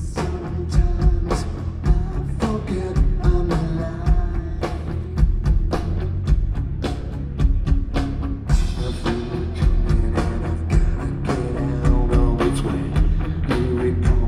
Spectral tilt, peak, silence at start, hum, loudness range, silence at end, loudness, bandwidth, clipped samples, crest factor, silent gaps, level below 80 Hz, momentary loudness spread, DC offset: -7.5 dB/octave; -6 dBFS; 0 s; none; 2 LU; 0 s; -23 LUFS; 10.5 kHz; under 0.1%; 14 dB; none; -22 dBFS; 6 LU; under 0.1%